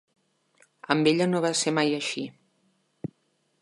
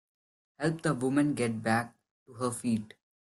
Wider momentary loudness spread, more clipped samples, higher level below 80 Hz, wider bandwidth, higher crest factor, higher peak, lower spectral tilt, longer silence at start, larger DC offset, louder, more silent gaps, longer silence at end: first, 18 LU vs 8 LU; neither; about the same, -72 dBFS vs -68 dBFS; about the same, 11.5 kHz vs 12.5 kHz; first, 24 dB vs 18 dB; first, -4 dBFS vs -14 dBFS; second, -4 dB/octave vs -6 dB/octave; first, 0.9 s vs 0.6 s; neither; first, -25 LUFS vs -31 LUFS; second, none vs 2.11-2.26 s; first, 0.55 s vs 0.4 s